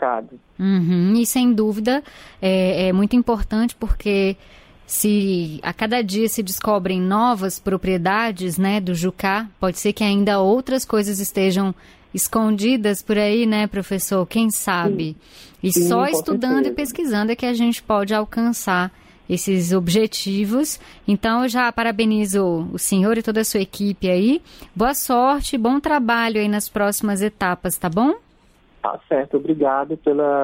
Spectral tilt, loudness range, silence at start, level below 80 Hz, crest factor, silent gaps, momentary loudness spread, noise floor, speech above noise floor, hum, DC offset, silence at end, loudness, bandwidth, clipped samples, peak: -5 dB/octave; 2 LU; 0 s; -40 dBFS; 14 dB; none; 6 LU; -54 dBFS; 35 dB; none; under 0.1%; 0 s; -20 LUFS; 16.5 kHz; under 0.1%; -6 dBFS